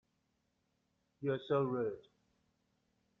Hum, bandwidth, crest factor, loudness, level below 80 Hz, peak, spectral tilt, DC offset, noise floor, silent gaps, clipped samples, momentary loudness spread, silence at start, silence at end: none; 5.8 kHz; 18 dB; -37 LUFS; -80 dBFS; -22 dBFS; -6.5 dB/octave; under 0.1%; -81 dBFS; none; under 0.1%; 8 LU; 1.2 s; 1.2 s